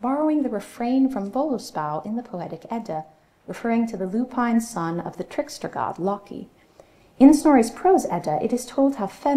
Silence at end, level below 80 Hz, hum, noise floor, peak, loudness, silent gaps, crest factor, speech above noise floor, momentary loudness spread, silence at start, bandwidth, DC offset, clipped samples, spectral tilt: 0 s; -56 dBFS; none; -53 dBFS; -2 dBFS; -23 LUFS; none; 20 dB; 31 dB; 15 LU; 0 s; 14.5 kHz; under 0.1%; under 0.1%; -6 dB/octave